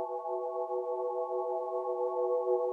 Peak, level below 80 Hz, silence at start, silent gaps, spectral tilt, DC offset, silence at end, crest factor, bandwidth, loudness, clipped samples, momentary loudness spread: -18 dBFS; under -90 dBFS; 0 s; none; -7 dB/octave; under 0.1%; 0 s; 14 dB; 2.3 kHz; -34 LUFS; under 0.1%; 5 LU